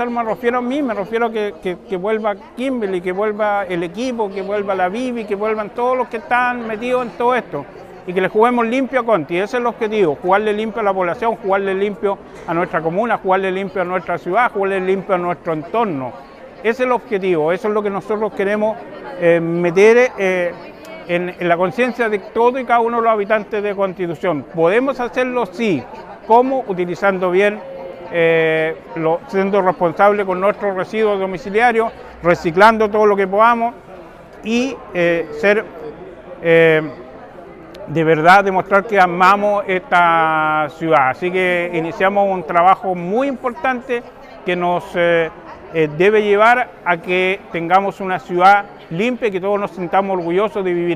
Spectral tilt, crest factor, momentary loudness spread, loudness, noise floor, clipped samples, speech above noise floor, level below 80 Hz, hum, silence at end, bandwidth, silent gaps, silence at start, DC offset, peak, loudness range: -6 dB/octave; 16 dB; 11 LU; -17 LUFS; -37 dBFS; under 0.1%; 21 dB; -52 dBFS; none; 0 s; 14 kHz; none; 0 s; under 0.1%; 0 dBFS; 5 LU